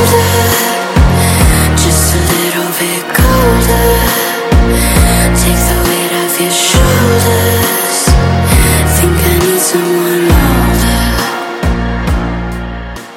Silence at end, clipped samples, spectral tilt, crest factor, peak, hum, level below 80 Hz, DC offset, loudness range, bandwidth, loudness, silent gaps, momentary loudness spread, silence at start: 0 s; 0.4%; -4.5 dB/octave; 10 dB; 0 dBFS; none; -16 dBFS; under 0.1%; 2 LU; 17.5 kHz; -10 LUFS; none; 6 LU; 0 s